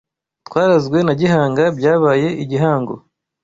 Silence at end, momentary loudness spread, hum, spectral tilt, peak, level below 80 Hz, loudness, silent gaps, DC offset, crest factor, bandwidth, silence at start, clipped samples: 0.45 s; 8 LU; none; -7.5 dB/octave; -2 dBFS; -54 dBFS; -15 LUFS; none; under 0.1%; 14 dB; 7.8 kHz; 0.5 s; under 0.1%